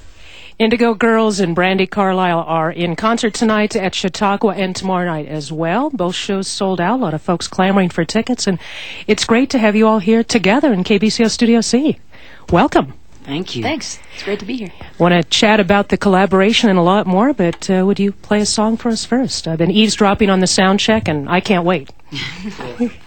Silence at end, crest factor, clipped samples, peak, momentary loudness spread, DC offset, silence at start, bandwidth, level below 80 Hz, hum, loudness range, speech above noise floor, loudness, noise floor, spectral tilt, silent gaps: 0.1 s; 16 dB; under 0.1%; 0 dBFS; 11 LU; 2%; 0 s; 17 kHz; -44 dBFS; none; 4 LU; 25 dB; -15 LUFS; -39 dBFS; -5 dB/octave; none